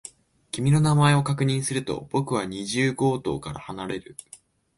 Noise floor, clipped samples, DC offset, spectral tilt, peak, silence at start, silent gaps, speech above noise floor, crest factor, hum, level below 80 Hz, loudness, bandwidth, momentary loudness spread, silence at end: -43 dBFS; under 0.1%; under 0.1%; -5.5 dB/octave; -6 dBFS; 0.05 s; none; 20 dB; 20 dB; none; -54 dBFS; -24 LUFS; 11.5 kHz; 16 LU; 0.4 s